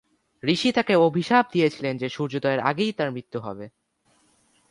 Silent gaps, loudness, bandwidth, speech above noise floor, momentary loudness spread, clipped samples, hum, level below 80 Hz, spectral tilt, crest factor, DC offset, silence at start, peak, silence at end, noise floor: none; -23 LUFS; 11.5 kHz; 42 dB; 14 LU; under 0.1%; none; -66 dBFS; -6 dB/octave; 20 dB; under 0.1%; 0.45 s; -4 dBFS; 1.05 s; -65 dBFS